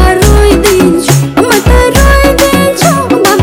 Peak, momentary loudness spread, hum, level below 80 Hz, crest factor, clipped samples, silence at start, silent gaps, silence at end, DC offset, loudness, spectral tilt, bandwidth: 0 dBFS; 2 LU; none; -12 dBFS; 6 dB; 10%; 0 s; none; 0 s; under 0.1%; -6 LUFS; -5 dB/octave; over 20 kHz